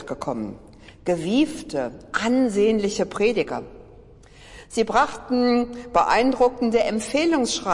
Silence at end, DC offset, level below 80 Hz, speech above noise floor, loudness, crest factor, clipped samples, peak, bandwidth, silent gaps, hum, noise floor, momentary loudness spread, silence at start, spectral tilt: 0 s; under 0.1%; -48 dBFS; 26 dB; -22 LUFS; 16 dB; under 0.1%; -6 dBFS; 11.5 kHz; none; none; -47 dBFS; 10 LU; 0 s; -4.5 dB/octave